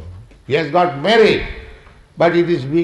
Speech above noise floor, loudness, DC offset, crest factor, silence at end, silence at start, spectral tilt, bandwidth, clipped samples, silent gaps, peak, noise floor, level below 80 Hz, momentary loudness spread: 27 dB; -15 LUFS; under 0.1%; 14 dB; 0 s; 0 s; -6.5 dB/octave; 10.5 kHz; under 0.1%; none; -2 dBFS; -41 dBFS; -38 dBFS; 10 LU